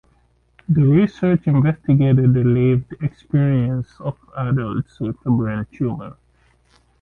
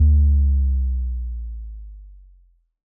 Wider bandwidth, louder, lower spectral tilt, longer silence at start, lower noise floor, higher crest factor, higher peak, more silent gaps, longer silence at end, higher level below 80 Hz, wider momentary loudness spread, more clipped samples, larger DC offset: first, 4.3 kHz vs 0.5 kHz; about the same, -19 LUFS vs -21 LUFS; second, -11 dB/octave vs -20.5 dB/octave; first, 0.7 s vs 0 s; about the same, -59 dBFS vs -56 dBFS; about the same, 14 dB vs 12 dB; first, -4 dBFS vs -8 dBFS; neither; about the same, 0.9 s vs 0.85 s; second, -46 dBFS vs -20 dBFS; second, 13 LU vs 22 LU; neither; neither